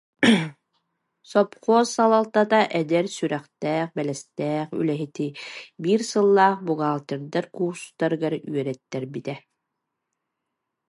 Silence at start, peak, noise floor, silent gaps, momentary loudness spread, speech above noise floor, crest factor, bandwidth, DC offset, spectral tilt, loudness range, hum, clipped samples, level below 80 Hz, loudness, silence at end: 0.2 s; -4 dBFS; -81 dBFS; none; 12 LU; 58 dB; 18 dB; 11.5 kHz; under 0.1%; -5.5 dB/octave; 7 LU; none; under 0.1%; -74 dBFS; -23 LUFS; 1.5 s